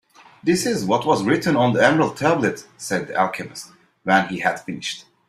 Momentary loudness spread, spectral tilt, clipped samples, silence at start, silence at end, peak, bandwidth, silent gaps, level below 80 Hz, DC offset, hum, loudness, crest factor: 13 LU; -5 dB/octave; under 0.1%; 0.45 s; 0.25 s; -2 dBFS; 15.5 kHz; none; -58 dBFS; under 0.1%; none; -20 LUFS; 20 dB